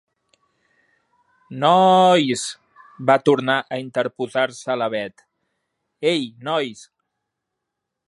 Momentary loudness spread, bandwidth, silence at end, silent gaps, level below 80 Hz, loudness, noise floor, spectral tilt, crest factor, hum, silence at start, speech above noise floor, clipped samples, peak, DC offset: 15 LU; 11.5 kHz; 1.3 s; none; -72 dBFS; -19 LUFS; -81 dBFS; -4.5 dB/octave; 20 dB; none; 1.5 s; 62 dB; under 0.1%; -2 dBFS; under 0.1%